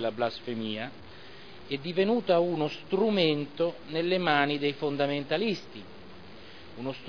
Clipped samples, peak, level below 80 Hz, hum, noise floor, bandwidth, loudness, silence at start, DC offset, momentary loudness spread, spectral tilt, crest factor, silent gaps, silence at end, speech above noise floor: under 0.1%; -8 dBFS; -66 dBFS; none; -48 dBFS; 5.4 kHz; -29 LUFS; 0 s; 0.4%; 23 LU; -7 dB/octave; 22 dB; none; 0 s; 20 dB